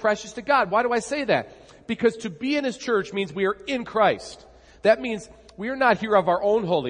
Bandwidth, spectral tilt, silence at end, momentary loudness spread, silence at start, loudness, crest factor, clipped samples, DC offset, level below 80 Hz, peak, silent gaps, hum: 10.5 kHz; -5 dB/octave; 0 s; 11 LU; 0 s; -23 LUFS; 18 dB; under 0.1%; under 0.1%; -58 dBFS; -4 dBFS; none; none